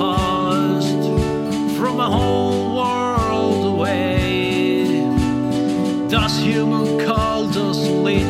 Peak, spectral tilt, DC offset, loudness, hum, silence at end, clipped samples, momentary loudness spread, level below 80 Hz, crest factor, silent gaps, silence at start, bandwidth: -4 dBFS; -6 dB/octave; under 0.1%; -18 LUFS; none; 0 s; under 0.1%; 2 LU; -34 dBFS; 12 dB; none; 0 s; 15 kHz